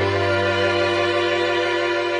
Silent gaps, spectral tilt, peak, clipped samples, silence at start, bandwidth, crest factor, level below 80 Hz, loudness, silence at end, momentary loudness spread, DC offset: none; -5 dB/octave; -8 dBFS; under 0.1%; 0 s; 10 kHz; 12 dB; -60 dBFS; -19 LUFS; 0 s; 1 LU; under 0.1%